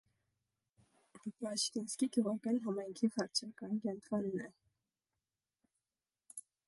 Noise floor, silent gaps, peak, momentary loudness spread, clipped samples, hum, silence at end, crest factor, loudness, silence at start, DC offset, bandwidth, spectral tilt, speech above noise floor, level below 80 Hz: under -90 dBFS; none; -20 dBFS; 15 LU; under 0.1%; none; 0.25 s; 20 dB; -38 LUFS; 1.15 s; under 0.1%; 11.5 kHz; -4 dB/octave; over 52 dB; -84 dBFS